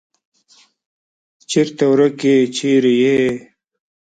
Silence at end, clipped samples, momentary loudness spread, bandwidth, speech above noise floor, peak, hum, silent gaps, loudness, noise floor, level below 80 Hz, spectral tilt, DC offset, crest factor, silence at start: 0.65 s; under 0.1%; 6 LU; 9.2 kHz; 39 dB; -2 dBFS; none; none; -15 LUFS; -53 dBFS; -60 dBFS; -5.5 dB/octave; under 0.1%; 16 dB; 1.5 s